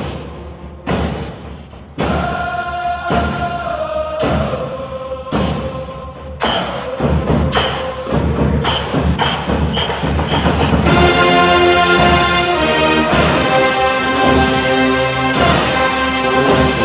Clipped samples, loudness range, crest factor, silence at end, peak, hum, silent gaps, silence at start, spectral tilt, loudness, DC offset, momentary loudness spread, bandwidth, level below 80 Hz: under 0.1%; 8 LU; 14 dB; 0 s; 0 dBFS; none; none; 0 s; -9.5 dB/octave; -14 LUFS; under 0.1%; 15 LU; 4 kHz; -26 dBFS